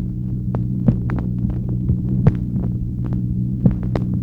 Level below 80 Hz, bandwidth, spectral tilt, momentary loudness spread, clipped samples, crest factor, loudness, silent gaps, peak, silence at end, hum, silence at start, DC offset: -28 dBFS; 4.1 kHz; -11.5 dB/octave; 5 LU; under 0.1%; 18 dB; -21 LUFS; none; 0 dBFS; 0 s; none; 0 s; under 0.1%